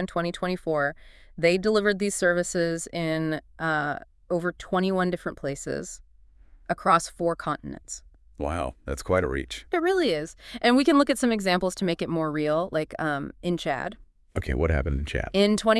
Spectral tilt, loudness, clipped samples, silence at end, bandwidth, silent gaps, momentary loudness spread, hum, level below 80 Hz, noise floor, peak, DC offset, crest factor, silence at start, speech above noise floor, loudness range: -5 dB/octave; -26 LUFS; under 0.1%; 0 s; 12 kHz; none; 12 LU; none; -42 dBFS; -53 dBFS; -6 dBFS; under 0.1%; 20 dB; 0 s; 28 dB; 5 LU